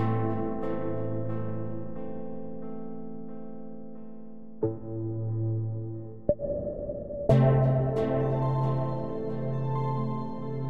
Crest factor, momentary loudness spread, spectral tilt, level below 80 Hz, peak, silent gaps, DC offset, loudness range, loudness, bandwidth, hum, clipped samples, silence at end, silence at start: 22 dB; 17 LU; -10.5 dB/octave; -48 dBFS; -8 dBFS; none; 1%; 11 LU; -30 LUFS; 4.5 kHz; none; under 0.1%; 0 s; 0 s